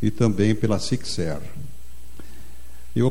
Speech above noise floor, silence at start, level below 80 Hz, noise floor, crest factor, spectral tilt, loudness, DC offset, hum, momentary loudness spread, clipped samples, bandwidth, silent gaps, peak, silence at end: 22 dB; 0 s; -44 dBFS; -44 dBFS; 18 dB; -6.5 dB/octave; -24 LUFS; 5%; none; 25 LU; under 0.1%; 16.5 kHz; none; -6 dBFS; 0 s